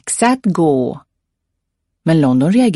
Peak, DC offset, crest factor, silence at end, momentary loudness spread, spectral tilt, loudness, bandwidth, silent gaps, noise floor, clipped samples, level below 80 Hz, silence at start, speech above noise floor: -2 dBFS; under 0.1%; 14 dB; 0 s; 11 LU; -6 dB/octave; -14 LUFS; 11.5 kHz; none; -74 dBFS; under 0.1%; -56 dBFS; 0.05 s; 61 dB